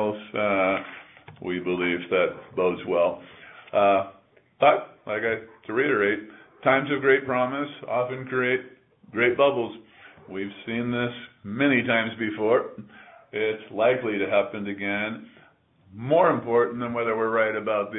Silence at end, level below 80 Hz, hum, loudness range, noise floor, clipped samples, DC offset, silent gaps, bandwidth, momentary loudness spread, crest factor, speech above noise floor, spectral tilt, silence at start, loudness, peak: 0 s; -68 dBFS; none; 3 LU; -58 dBFS; under 0.1%; under 0.1%; none; 4 kHz; 14 LU; 22 dB; 34 dB; -10 dB/octave; 0 s; -25 LUFS; -4 dBFS